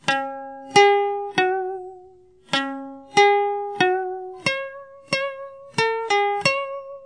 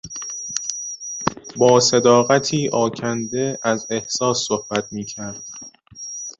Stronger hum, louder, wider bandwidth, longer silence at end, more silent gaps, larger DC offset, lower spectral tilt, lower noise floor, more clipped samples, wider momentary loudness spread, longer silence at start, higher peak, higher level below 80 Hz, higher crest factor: neither; about the same, -21 LUFS vs -20 LUFS; first, 10.5 kHz vs 8.2 kHz; about the same, 0 s vs 0.05 s; neither; neither; about the same, -3 dB/octave vs -3.5 dB/octave; first, -50 dBFS vs -40 dBFS; neither; about the same, 18 LU vs 17 LU; about the same, 0.05 s vs 0.05 s; about the same, -2 dBFS vs -2 dBFS; second, -68 dBFS vs -56 dBFS; about the same, 20 dB vs 18 dB